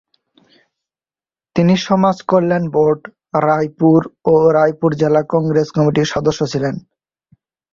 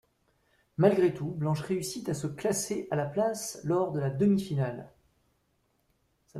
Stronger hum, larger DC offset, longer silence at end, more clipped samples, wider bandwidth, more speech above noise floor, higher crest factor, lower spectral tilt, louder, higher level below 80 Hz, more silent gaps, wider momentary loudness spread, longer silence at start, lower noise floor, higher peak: neither; neither; first, 0.95 s vs 0 s; neither; second, 7.4 kHz vs 14.5 kHz; first, over 76 dB vs 45 dB; second, 14 dB vs 22 dB; about the same, -7 dB/octave vs -6 dB/octave; first, -15 LUFS vs -29 LUFS; first, -52 dBFS vs -64 dBFS; neither; about the same, 7 LU vs 9 LU; first, 1.55 s vs 0.8 s; first, under -90 dBFS vs -73 dBFS; first, -2 dBFS vs -10 dBFS